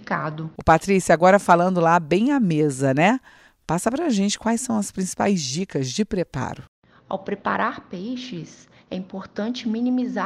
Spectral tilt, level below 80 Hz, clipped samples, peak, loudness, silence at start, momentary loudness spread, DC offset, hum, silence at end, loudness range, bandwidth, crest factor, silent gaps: -5.5 dB/octave; -50 dBFS; under 0.1%; -2 dBFS; -21 LUFS; 0 s; 16 LU; under 0.1%; none; 0 s; 10 LU; 14.5 kHz; 18 dB; 6.68-6.82 s